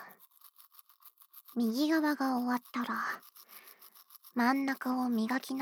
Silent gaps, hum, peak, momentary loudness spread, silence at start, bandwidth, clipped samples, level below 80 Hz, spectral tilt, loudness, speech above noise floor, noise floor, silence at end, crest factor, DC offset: none; none; -16 dBFS; 24 LU; 0 s; over 20 kHz; under 0.1%; -90 dBFS; -4.5 dB/octave; -33 LUFS; 29 dB; -60 dBFS; 0 s; 18 dB; under 0.1%